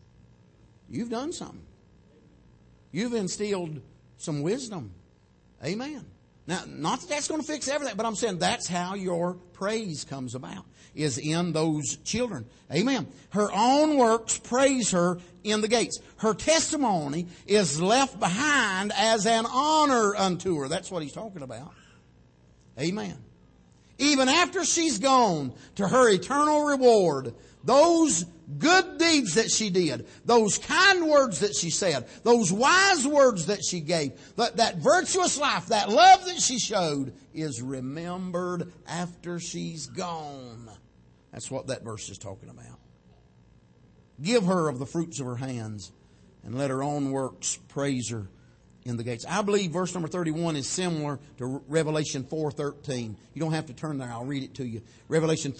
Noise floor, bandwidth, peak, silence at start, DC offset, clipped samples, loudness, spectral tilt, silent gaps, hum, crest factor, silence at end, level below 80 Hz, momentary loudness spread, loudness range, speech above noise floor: -60 dBFS; 8.8 kHz; -6 dBFS; 0.9 s; under 0.1%; under 0.1%; -25 LUFS; -3.5 dB/octave; none; none; 20 dB; 0 s; -60 dBFS; 16 LU; 12 LU; 34 dB